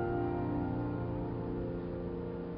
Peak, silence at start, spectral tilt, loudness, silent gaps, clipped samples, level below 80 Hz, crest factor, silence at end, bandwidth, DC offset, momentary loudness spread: -22 dBFS; 0 s; -9 dB/octave; -37 LUFS; none; under 0.1%; -50 dBFS; 14 dB; 0 s; 5.2 kHz; under 0.1%; 5 LU